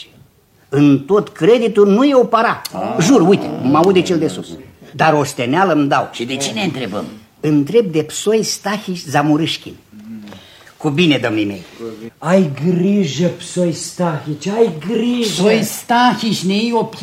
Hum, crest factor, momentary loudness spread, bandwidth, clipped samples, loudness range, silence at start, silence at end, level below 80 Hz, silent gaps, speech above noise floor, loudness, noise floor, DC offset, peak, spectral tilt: none; 16 dB; 13 LU; 16 kHz; under 0.1%; 5 LU; 0 s; 0 s; -58 dBFS; none; 36 dB; -15 LUFS; -51 dBFS; under 0.1%; 0 dBFS; -5.5 dB/octave